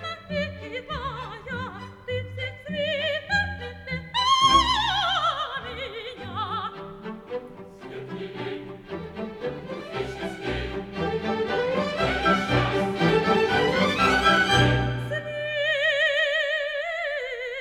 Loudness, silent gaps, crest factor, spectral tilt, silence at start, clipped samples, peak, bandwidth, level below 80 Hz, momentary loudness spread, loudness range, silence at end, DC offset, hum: -24 LUFS; none; 18 dB; -4.5 dB/octave; 0 s; under 0.1%; -6 dBFS; 14.5 kHz; -44 dBFS; 16 LU; 13 LU; 0 s; under 0.1%; none